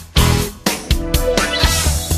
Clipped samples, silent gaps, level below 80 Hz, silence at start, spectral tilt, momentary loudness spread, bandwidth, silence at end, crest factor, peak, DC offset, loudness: under 0.1%; none; -20 dBFS; 0 s; -3.5 dB/octave; 5 LU; 16 kHz; 0 s; 16 dB; 0 dBFS; under 0.1%; -16 LUFS